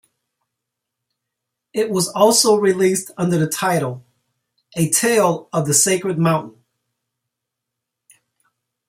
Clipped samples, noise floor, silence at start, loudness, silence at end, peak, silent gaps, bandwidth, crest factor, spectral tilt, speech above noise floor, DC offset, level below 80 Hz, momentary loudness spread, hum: under 0.1%; -81 dBFS; 1.75 s; -17 LUFS; 2.4 s; -2 dBFS; none; 16 kHz; 20 dB; -4 dB/octave; 64 dB; under 0.1%; -62 dBFS; 10 LU; none